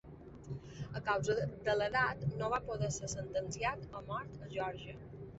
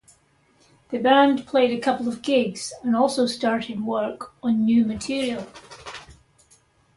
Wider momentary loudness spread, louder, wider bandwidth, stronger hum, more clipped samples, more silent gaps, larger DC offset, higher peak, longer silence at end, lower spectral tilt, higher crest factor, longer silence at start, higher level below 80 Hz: second, 15 LU vs 19 LU; second, -38 LUFS vs -22 LUFS; second, 8.2 kHz vs 11.5 kHz; neither; neither; neither; neither; second, -18 dBFS vs -4 dBFS; second, 0 s vs 0.85 s; about the same, -4.5 dB/octave vs -4.5 dB/octave; about the same, 20 dB vs 18 dB; second, 0.05 s vs 0.9 s; about the same, -58 dBFS vs -58 dBFS